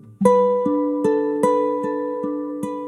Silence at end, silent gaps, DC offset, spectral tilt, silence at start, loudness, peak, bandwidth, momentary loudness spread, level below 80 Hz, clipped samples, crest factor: 0 s; none; under 0.1%; -7.5 dB/octave; 0.05 s; -20 LUFS; -2 dBFS; 12.5 kHz; 9 LU; -66 dBFS; under 0.1%; 18 dB